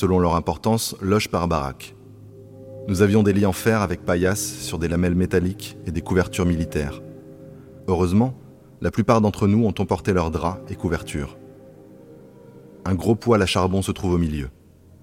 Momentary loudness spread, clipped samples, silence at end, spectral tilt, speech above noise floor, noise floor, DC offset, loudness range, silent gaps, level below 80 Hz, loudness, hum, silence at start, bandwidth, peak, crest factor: 17 LU; under 0.1%; 0.5 s; -6 dB/octave; 24 dB; -45 dBFS; under 0.1%; 3 LU; none; -40 dBFS; -22 LUFS; none; 0 s; 16.5 kHz; -4 dBFS; 18 dB